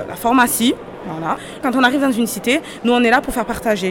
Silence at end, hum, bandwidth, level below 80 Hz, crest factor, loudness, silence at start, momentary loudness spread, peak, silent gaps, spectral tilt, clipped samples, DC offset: 0 s; none; 17 kHz; -44 dBFS; 16 dB; -17 LUFS; 0 s; 10 LU; -2 dBFS; none; -3.5 dB/octave; under 0.1%; under 0.1%